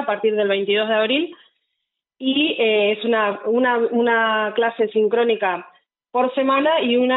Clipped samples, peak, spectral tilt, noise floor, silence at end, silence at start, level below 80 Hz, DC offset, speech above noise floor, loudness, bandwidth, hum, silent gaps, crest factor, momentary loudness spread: under 0.1%; -6 dBFS; -1 dB/octave; -79 dBFS; 0 s; 0 s; -76 dBFS; under 0.1%; 60 dB; -19 LUFS; 4.1 kHz; none; none; 12 dB; 5 LU